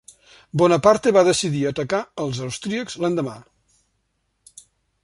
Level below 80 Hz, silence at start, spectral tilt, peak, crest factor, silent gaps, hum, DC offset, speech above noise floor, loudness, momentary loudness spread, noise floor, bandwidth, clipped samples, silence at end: -56 dBFS; 0.55 s; -5 dB/octave; -2 dBFS; 20 dB; none; none; under 0.1%; 51 dB; -20 LUFS; 12 LU; -71 dBFS; 11.5 kHz; under 0.1%; 1.6 s